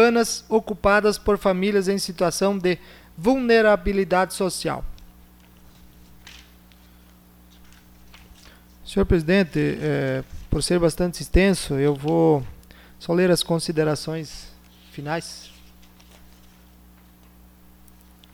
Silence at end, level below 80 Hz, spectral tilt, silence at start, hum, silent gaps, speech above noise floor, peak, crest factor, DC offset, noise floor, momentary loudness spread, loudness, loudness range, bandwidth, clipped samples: 2.85 s; -38 dBFS; -5 dB/octave; 0 s; 60 Hz at -50 dBFS; none; 30 dB; -4 dBFS; 20 dB; under 0.1%; -51 dBFS; 13 LU; -22 LUFS; 15 LU; 19.5 kHz; under 0.1%